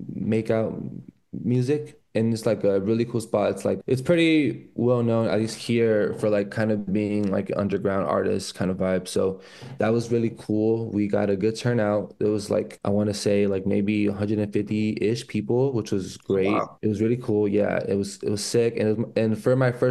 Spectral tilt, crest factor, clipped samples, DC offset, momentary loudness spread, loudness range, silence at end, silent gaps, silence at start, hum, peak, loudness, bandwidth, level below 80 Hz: -6.5 dB/octave; 16 dB; under 0.1%; under 0.1%; 5 LU; 2 LU; 0 s; none; 0 s; none; -8 dBFS; -24 LUFS; 12.5 kHz; -60 dBFS